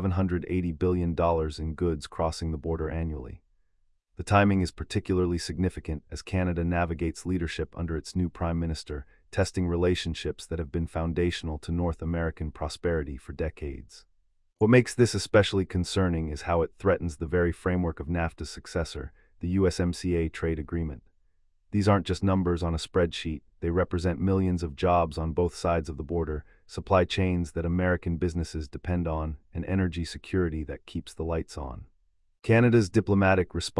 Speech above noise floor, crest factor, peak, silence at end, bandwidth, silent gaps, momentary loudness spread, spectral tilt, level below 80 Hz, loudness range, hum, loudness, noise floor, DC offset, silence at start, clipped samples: 41 dB; 20 dB; -8 dBFS; 0 s; 12 kHz; none; 13 LU; -6.5 dB/octave; -44 dBFS; 5 LU; none; -28 LUFS; -68 dBFS; under 0.1%; 0 s; under 0.1%